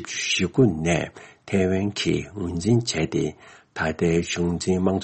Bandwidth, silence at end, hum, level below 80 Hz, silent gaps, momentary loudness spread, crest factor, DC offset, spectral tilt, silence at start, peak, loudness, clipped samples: 8.8 kHz; 0 s; none; -48 dBFS; none; 8 LU; 16 dB; under 0.1%; -5 dB/octave; 0 s; -6 dBFS; -23 LUFS; under 0.1%